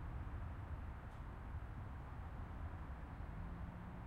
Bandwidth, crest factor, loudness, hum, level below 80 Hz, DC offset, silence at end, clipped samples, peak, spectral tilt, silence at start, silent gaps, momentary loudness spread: 9 kHz; 12 dB; -51 LUFS; none; -52 dBFS; under 0.1%; 0 s; under 0.1%; -36 dBFS; -8.5 dB/octave; 0 s; none; 3 LU